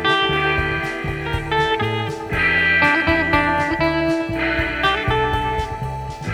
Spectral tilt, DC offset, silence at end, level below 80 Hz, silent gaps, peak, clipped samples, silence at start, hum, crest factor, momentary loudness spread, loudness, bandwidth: -5.5 dB/octave; under 0.1%; 0 s; -34 dBFS; none; -2 dBFS; under 0.1%; 0 s; none; 18 dB; 10 LU; -19 LUFS; 17 kHz